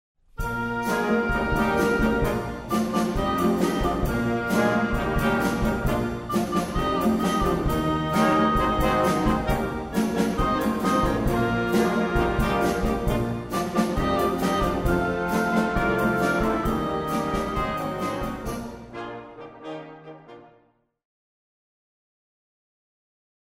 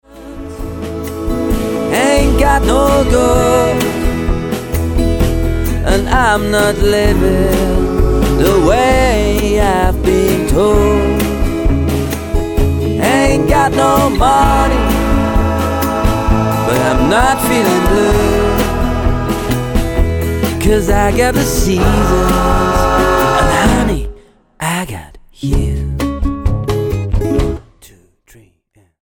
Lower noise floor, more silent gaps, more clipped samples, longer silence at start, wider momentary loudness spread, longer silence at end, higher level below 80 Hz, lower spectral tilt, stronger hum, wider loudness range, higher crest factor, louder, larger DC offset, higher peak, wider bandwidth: first, -63 dBFS vs -54 dBFS; neither; neither; first, 0.4 s vs 0.15 s; about the same, 9 LU vs 7 LU; first, 3.05 s vs 1.15 s; second, -36 dBFS vs -18 dBFS; about the same, -6 dB/octave vs -5.5 dB/octave; neither; first, 9 LU vs 5 LU; about the same, 16 dB vs 12 dB; second, -24 LUFS vs -13 LUFS; neither; second, -8 dBFS vs 0 dBFS; about the same, 16 kHz vs 17.5 kHz